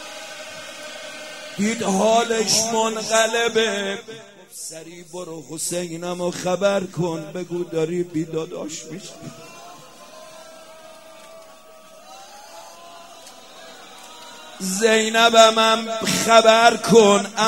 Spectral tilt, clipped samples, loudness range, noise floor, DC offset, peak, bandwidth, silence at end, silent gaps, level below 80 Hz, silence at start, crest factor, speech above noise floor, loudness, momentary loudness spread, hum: -3 dB/octave; under 0.1%; 25 LU; -46 dBFS; 0.2%; 0 dBFS; 16 kHz; 0 s; none; -66 dBFS; 0 s; 22 dB; 27 dB; -18 LUFS; 27 LU; none